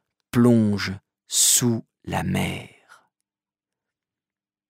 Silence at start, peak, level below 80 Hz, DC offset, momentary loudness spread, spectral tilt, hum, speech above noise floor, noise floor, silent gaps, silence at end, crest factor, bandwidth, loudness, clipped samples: 0.35 s; -6 dBFS; -56 dBFS; under 0.1%; 14 LU; -3.5 dB/octave; none; over 69 dB; under -90 dBFS; none; 2.05 s; 18 dB; 16 kHz; -21 LUFS; under 0.1%